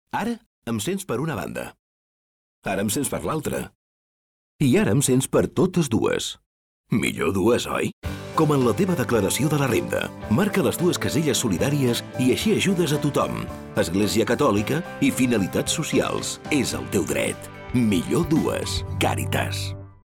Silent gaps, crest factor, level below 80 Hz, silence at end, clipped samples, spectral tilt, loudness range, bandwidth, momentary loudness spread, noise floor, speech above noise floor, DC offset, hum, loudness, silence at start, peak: 0.46-0.62 s, 1.79-2.62 s, 3.75-4.59 s, 6.46-6.84 s, 7.93-8.02 s; 12 dB; -48 dBFS; 0.15 s; under 0.1%; -5 dB/octave; 6 LU; 19 kHz; 9 LU; under -90 dBFS; over 68 dB; under 0.1%; none; -23 LUFS; 0.15 s; -10 dBFS